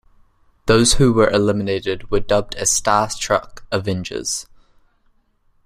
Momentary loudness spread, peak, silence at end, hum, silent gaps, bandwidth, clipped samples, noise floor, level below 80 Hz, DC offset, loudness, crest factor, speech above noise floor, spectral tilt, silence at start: 10 LU; 0 dBFS; 1.2 s; none; none; 16 kHz; under 0.1%; -59 dBFS; -34 dBFS; under 0.1%; -18 LUFS; 18 dB; 42 dB; -4 dB/octave; 0.65 s